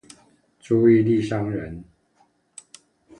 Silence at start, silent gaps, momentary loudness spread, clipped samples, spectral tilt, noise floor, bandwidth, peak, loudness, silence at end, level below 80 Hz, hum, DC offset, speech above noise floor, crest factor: 0.7 s; none; 26 LU; under 0.1%; -8 dB/octave; -64 dBFS; 10 kHz; -6 dBFS; -20 LUFS; 1.35 s; -54 dBFS; none; under 0.1%; 44 dB; 18 dB